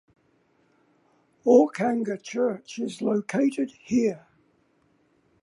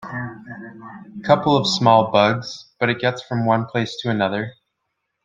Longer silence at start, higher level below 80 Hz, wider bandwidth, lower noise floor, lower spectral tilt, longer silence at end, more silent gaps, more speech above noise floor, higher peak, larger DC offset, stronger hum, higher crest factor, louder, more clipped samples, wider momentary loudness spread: first, 1.45 s vs 0 s; second, -70 dBFS vs -60 dBFS; first, 11.5 kHz vs 9.2 kHz; second, -66 dBFS vs -76 dBFS; about the same, -6 dB/octave vs -5.5 dB/octave; first, 1.25 s vs 0.75 s; neither; second, 42 dB vs 57 dB; second, -6 dBFS vs -2 dBFS; neither; neither; about the same, 20 dB vs 20 dB; second, -25 LUFS vs -19 LUFS; neither; second, 13 LU vs 21 LU